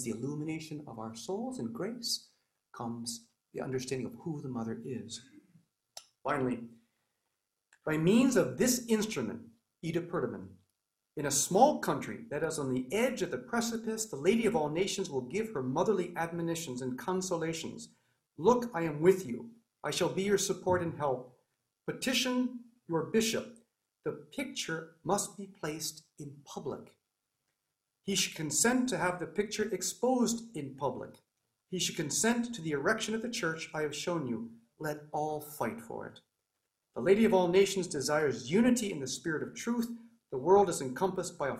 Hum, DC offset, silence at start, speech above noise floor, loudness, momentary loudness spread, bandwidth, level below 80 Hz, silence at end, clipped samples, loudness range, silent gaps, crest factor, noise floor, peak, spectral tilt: none; under 0.1%; 0 s; 53 dB; -33 LUFS; 16 LU; 16 kHz; -68 dBFS; 0 s; under 0.1%; 8 LU; none; 22 dB; -86 dBFS; -12 dBFS; -4 dB/octave